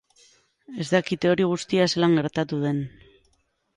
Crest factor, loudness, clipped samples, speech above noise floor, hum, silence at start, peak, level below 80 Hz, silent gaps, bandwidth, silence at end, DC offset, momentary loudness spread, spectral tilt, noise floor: 18 dB; -23 LUFS; under 0.1%; 45 dB; none; 0.7 s; -6 dBFS; -62 dBFS; none; 11.5 kHz; 0.9 s; under 0.1%; 12 LU; -6 dB/octave; -68 dBFS